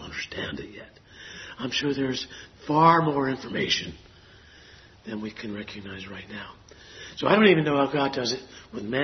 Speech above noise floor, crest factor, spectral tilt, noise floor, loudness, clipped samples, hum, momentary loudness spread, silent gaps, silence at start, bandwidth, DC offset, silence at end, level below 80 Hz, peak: 26 dB; 24 dB; -5 dB/octave; -52 dBFS; -24 LUFS; under 0.1%; none; 23 LU; none; 0 s; 6.4 kHz; under 0.1%; 0 s; -58 dBFS; -4 dBFS